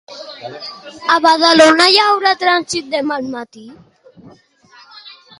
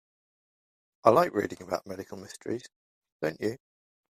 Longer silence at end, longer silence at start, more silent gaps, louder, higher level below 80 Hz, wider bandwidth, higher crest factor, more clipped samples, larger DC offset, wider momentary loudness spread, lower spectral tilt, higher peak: second, 0.3 s vs 0.55 s; second, 0.1 s vs 1.05 s; second, none vs 2.76-3.01 s, 3.12-3.19 s; first, -12 LUFS vs -29 LUFS; first, -60 dBFS vs -70 dBFS; about the same, 14 kHz vs 15 kHz; second, 16 dB vs 28 dB; neither; neither; first, 22 LU vs 18 LU; second, -2 dB/octave vs -6 dB/octave; first, 0 dBFS vs -4 dBFS